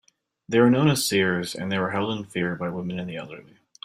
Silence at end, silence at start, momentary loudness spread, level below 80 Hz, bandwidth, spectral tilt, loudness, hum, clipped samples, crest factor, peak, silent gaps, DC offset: 0.45 s; 0.5 s; 15 LU; -62 dBFS; 16 kHz; -5 dB/octave; -24 LUFS; none; under 0.1%; 18 dB; -6 dBFS; none; under 0.1%